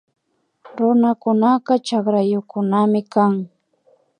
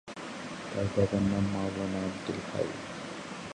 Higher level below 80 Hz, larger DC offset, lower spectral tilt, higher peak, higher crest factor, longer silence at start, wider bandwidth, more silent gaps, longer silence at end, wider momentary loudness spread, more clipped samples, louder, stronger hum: second, -72 dBFS vs -52 dBFS; neither; first, -7.5 dB/octave vs -6 dB/octave; first, -2 dBFS vs -14 dBFS; about the same, 16 dB vs 18 dB; first, 0.65 s vs 0.05 s; about the same, 10 kHz vs 11 kHz; neither; first, 0.75 s vs 0 s; second, 6 LU vs 12 LU; neither; first, -18 LUFS vs -33 LUFS; neither